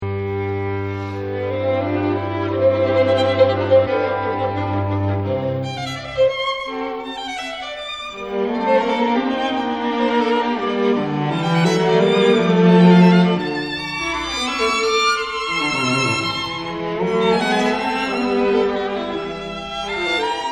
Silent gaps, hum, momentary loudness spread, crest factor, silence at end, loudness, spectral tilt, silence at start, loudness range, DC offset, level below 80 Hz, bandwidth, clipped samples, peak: none; none; 11 LU; 18 dB; 0 s; -19 LUFS; -6 dB/octave; 0 s; 7 LU; 0.1%; -50 dBFS; 11.5 kHz; under 0.1%; 0 dBFS